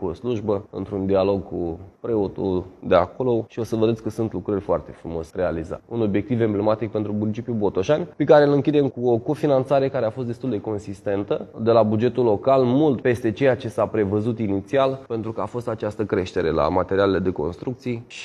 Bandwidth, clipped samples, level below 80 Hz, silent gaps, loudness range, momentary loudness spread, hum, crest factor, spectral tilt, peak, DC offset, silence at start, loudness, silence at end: 12 kHz; under 0.1%; -52 dBFS; none; 4 LU; 10 LU; none; 20 dB; -8 dB/octave; -2 dBFS; under 0.1%; 0 s; -22 LUFS; 0 s